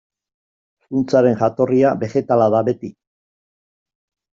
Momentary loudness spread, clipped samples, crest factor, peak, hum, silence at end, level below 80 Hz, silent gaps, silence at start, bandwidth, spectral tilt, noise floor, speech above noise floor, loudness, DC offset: 9 LU; under 0.1%; 16 dB; -2 dBFS; none; 1.5 s; -60 dBFS; none; 0.9 s; 7.4 kHz; -7.5 dB/octave; under -90 dBFS; over 74 dB; -17 LUFS; under 0.1%